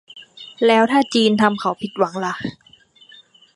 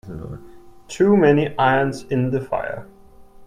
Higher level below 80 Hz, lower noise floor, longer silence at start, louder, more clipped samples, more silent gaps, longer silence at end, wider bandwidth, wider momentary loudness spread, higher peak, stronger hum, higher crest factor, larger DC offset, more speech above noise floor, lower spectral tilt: second, -64 dBFS vs -50 dBFS; first, -49 dBFS vs -45 dBFS; about the same, 0.15 s vs 0.05 s; about the same, -18 LUFS vs -19 LUFS; neither; neither; first, 1.05 s vs 0 s; about the same, 11.5 kHz vs 12 kHz; second, 15 LU vs 20 LU; about the same, -2 dBFS vs -2 dBFS; neither; about the same, 18 dB vs 18 dB; neither; first, 32 dB vs 26 dB; second, -5 dB/octave vs -7 dB/octave